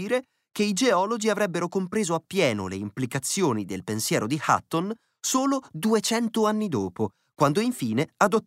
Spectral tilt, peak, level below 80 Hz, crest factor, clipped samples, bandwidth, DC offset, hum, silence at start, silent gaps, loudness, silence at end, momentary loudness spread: -4.5 dB/octave; -6 dBFS; -68 dBFS; 18 dB; under 0.1%; 16 kHz; under 0.1%; none; 0 s; none; -25 LUFS; 0.05 s; 8 LU